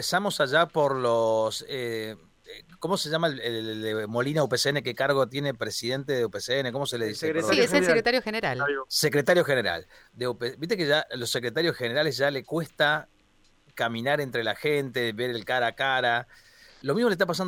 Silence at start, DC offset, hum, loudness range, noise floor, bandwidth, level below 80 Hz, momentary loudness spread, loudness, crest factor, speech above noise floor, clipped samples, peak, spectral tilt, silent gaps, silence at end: 0 s; under 0.1%; none; 4 LU; -62 dBFS; 17.5 kHz; -62 dBFS; 9 LU; -26 LUFS; 20 dB; 35 dB; under 0.1%; -8 dBFS; -4 dB/octave; none; 0 s